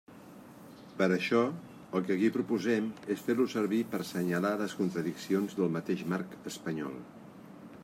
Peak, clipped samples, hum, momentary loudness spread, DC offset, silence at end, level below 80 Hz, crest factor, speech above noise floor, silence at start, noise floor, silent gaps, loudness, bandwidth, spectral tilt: -14 dBFS; under 0.1%; none; 21 LU; under 0.1%; 0 s; -74 dBFS; 20 dB; 20 dB; 0.1 s; -51 dBFS; none; -32 LUFS; 16 kHz; -6 dB/octave